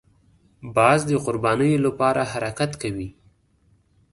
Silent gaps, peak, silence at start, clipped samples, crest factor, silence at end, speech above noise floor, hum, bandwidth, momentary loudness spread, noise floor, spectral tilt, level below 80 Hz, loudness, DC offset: none; -2 dBFS; 0.65 s; under 0.1%; 20 dB; 1 s; 40 dB; none; 11.5 kHz; 13 LU; -61 dBFS; -6 dB/octave; -52 dBFS; -21 LUFS; under 0.1%